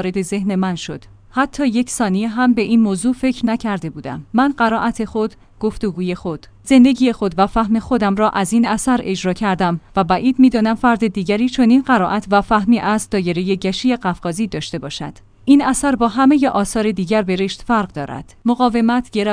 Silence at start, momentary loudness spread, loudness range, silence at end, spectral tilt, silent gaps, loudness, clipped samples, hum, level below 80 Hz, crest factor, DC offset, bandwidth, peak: 0 s; 12 LU; 3 LU; 0 s; -5.5 dB/octave; none; -17 LUFS; under 0.1%; none; -42 dBFS; 16 dB; under 0.1%; 10.5 kHz; 0 dBFS